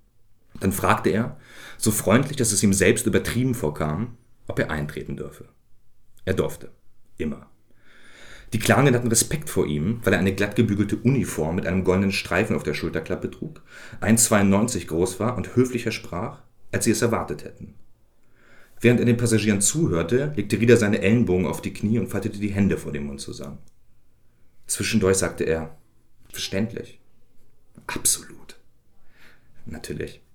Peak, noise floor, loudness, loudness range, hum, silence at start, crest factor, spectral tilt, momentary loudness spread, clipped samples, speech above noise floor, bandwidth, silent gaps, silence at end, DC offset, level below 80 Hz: -4 dBFS; -53 dBFS; -23 LUFS; 9 LU; none; 0.55 s; 20 dB; -5 dB/octave; 16 LU; under 0.1%; 31 dB; over 20 kHz; none; 0.2 s; under 0.1%; -48 dBFS